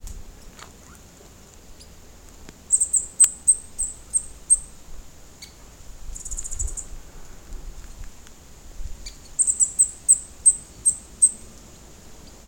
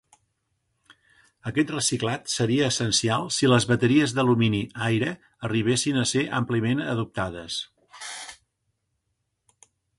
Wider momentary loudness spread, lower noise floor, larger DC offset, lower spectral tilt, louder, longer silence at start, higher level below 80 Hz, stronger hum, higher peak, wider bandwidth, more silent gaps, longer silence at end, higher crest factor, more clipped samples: first, 25 LU vs 15 LU; second, -47 dBFS vs -77 dBFS; neither; second, -0.5 dB/octave vs -4.5 dB/octave; first, -19 LUFS vs -24 LUFS; second, 0 s vs 1.45 s; first, -40 dBFS vs -56 dBFS; neither; first, -4 dBFS vs -8 dBFS; first, 17 kHz vs 11.5 kHz; neither; second, 0.15 s vs 1.65 s; about the same, 22 dB vs 18 dB; neither